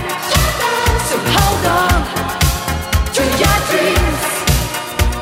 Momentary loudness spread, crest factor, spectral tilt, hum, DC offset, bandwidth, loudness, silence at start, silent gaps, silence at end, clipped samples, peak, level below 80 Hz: 5 LU; 14 dB; -4 dB/octave; none; under 0.1%; 16.5 kHz; -15 LUFS; 0 s; none; 0 s; under 0.1%; 0 dBFS; -22 dBFS